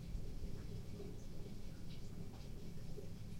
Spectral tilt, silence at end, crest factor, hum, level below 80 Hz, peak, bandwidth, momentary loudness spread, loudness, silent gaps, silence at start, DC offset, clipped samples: -6.5 dB/octave; 0 s; 14 dB; none; -52 dBFS; -32 dBFS; 16 kHz; 3 LU; -52 LUFS; none; 0 s; under 0.1%; under 0.1%